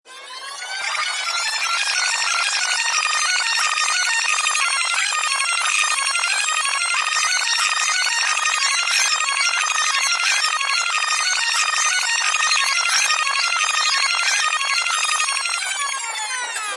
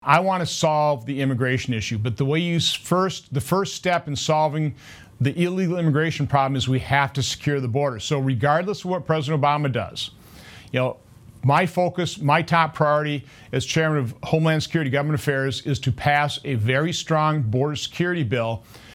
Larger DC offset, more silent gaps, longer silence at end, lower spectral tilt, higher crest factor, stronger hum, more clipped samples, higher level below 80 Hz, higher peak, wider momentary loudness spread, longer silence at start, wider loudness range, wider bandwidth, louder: neither; neither; about the same, 0 s vs 0 s; second, 6 dB/octave vs -5.5 dB/octave; second, 16 dB vs 22 dB; neither; neither; second, -78 dBFS vs -54 dBFS; second, -4 dBFS vs 0 dBFS; about the same, 5 LU vs 6 LU; about the same, 0.05 s vs 0.05 s; about the same, 1 LU vs 2 LU; second, 11.5 kHz vs 16 kHz; first, -18 LUFS vs -22 LUFS